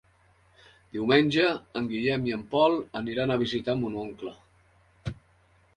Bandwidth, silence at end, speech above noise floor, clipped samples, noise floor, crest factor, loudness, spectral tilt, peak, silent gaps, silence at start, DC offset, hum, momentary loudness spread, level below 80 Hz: 10.5 kHz; 0.65 s; 36 dB; under 0.1%; -63 dBFS; 20 dB; -27 LUFS; -6.5 dB/octave; -8 dBFS; none; 0.95 s; under 0.1%; none; 17 LU; -58 dBFS